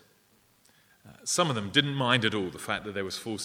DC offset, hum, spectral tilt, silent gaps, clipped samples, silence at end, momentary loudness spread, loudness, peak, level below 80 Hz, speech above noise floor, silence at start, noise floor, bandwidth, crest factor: under 0.1%; none; -3.5 dB/octave; none; under 0.1%; 0 s; 9 LU; -28 LUFS; -6 dBFS; -66 dBFS; 36 dB; 1.05 s; -65 dBFS; 17.5 kHz; 24 dB